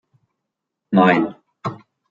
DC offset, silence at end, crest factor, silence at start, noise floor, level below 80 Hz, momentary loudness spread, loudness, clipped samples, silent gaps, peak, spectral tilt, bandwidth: under 0.1%; 0.35 s; 20 dB; 0.9 s; -80 dBFS; -66 dBFS; 16 LU; -17 LUFS; under 0.1%; none; -2 dBFS; -8 dB/octave; 7.2 kHz